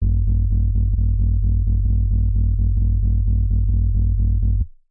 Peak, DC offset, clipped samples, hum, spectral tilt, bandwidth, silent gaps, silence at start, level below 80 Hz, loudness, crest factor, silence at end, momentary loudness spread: -12 dBFS; under 0.1%; under 0.1%; none; -17 dB/octave; 0.8 kHz; none; 0 s; -18 dBFS; -20 LUFS; 4 dB; 0.25 s; 0 LU